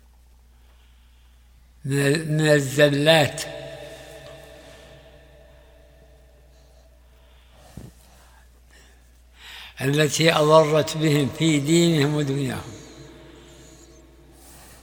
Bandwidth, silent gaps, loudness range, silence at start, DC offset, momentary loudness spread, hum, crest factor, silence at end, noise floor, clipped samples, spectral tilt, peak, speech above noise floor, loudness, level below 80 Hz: over 20 kHz; none; 7 LU; 1.85 s; under 0.1%; 26 LU; 60 Hz at -55 dBFS; 24 dB; 1.8 s; -52 dBFS; under 0.1%; -5 dB/octave; 0 dBFS; 33 dB; -20 LUFS; -52 dBFS